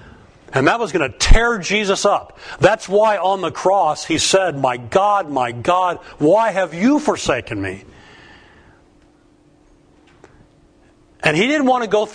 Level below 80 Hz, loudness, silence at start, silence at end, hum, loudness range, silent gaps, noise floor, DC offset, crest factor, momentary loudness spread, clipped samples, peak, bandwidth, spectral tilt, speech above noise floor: -26 dBFS; -17 LUFS; 0.05 s; 0 s; none; 9 LU; none; -52 dBFS; under 0.1%; 18 dB; 7 LU; under 0.1%; 0 dBFS; 10.5 kHz; -4 dB/octave; 36 dB